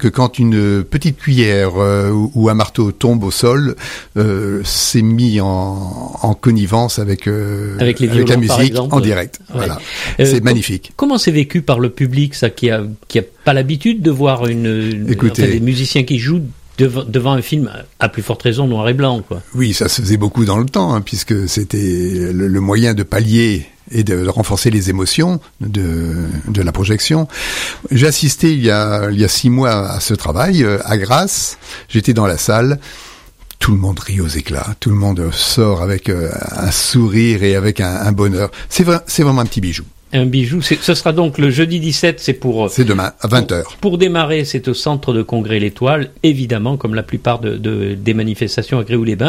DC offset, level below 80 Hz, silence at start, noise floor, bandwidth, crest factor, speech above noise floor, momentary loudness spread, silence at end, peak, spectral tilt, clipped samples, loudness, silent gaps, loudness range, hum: under 0.1%; -34 dBFS; 0 s; -38 dBFS; 16 kHz; 14 dB; 24 dB; 7 LU; 0 s; 0 dBFS; -5.5 dB/octave; under 0.1%; -14 LUFS; none; 3 LU; none